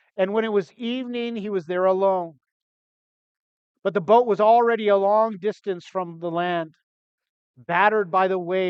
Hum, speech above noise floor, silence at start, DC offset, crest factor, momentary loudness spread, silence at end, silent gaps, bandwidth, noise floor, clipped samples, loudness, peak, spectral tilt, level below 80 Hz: none; over 69 dB; 0.15 s; under 0.1%; 20 dB; 12 LU; 0 s; 2.52-3.75 s, 6.83-7.18 s, 7.29-7.54 s; 7.4 kHz; under -90 dBFS; under 0.1%; -22 LUFS; -4 dBFS; -7 dB/octave; -80 dBFS